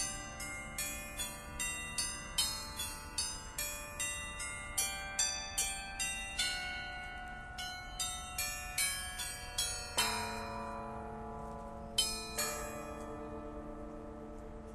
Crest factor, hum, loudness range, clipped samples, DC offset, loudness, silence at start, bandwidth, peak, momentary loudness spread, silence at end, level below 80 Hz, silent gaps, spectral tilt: 22 dB; none; 3 LU; under 0.1%; under 0.1%; -38 LUFS; 0 s; 14 kHz; -18 dBFS; 12 LU; 0 s; -52 dBFS; none; -1 dB/octave